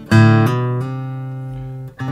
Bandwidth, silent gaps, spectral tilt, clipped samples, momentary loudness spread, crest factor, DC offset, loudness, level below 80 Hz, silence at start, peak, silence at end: 12.5 kHz; none; -7.5 dB/octave; under 0.1%; 17 LU; 16 dB; under 0.1%; -17 LUFS; -46 dBFS; 0 s; 0 dBFS; 0 s